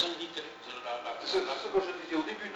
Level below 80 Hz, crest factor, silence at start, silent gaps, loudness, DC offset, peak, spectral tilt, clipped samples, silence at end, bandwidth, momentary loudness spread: -68 dBFS; 20 dB; 0 s; none; -34 LUFS; under 0.1%; -14 dBFS; -3 dB/octave; under 0.1%; 0 s; 8.4 kHz; 9 LU